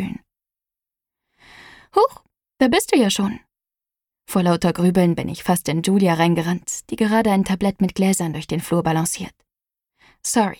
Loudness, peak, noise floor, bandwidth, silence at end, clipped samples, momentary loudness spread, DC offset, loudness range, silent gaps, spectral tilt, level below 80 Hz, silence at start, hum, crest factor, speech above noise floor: -20 LUFS; -2 dBFS; -89 dBFS; 18.5 kHz; 0.05 s; under 0.1%; 9 LU; under 0.1%; 3 LU; none; -5 dB/octave; -50 dBFS; 0 s; none; 18 dB; 70 dB